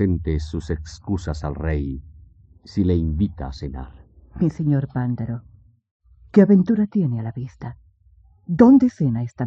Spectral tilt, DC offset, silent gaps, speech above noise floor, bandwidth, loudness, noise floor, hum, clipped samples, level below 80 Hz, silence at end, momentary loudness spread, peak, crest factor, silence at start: -9 dB/octave; under 0.1%; 5.91-6.00 s; 34 dB; 8 kHz; -21 LUFS; -54 dBFS; none; under 0.1%; -38 dBFS; 0 s; 18 LU; -2 dBFS; 20 dB; 0 s